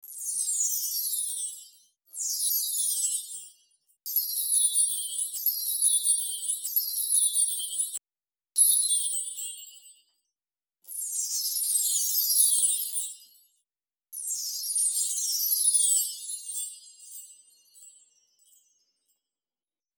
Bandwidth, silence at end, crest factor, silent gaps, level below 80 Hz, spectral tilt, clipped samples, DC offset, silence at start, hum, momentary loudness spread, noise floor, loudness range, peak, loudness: over 20 kHz; 2.1 s; 20 dB; none; under -90 dBFS; 7 dB/octave; under 0.1%; under 0.1%; 0.05 s; none; 17 LU; under -90 dBFS; 5 LU; -10 dBFS; -25 LUFS